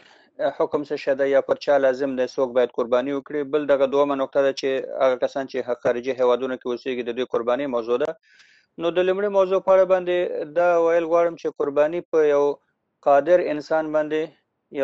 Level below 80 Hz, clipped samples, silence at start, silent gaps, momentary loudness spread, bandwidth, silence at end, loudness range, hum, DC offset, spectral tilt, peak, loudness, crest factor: -64 dBFS; under 0.1%; 0.4 s; 12.05-12.12 s; 9 LU; 7.4 kHz; 0 s; 4 LU; none; under 0.1%; -5.5 dB/octave; -6 dBFS; -22 LUFS; 16 dB